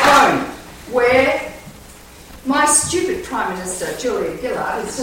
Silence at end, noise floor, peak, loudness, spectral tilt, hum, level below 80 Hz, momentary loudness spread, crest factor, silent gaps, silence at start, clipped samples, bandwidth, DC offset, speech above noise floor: 0 s; -40 dBFS; 0 dBFS; -17 LUFS; -2.5 dB/octave; none; -44 dBFS; 16 LU; 18 dB; none; 0 s; under 0.1%; 16.5 kHz; under 0.1%; 18 dB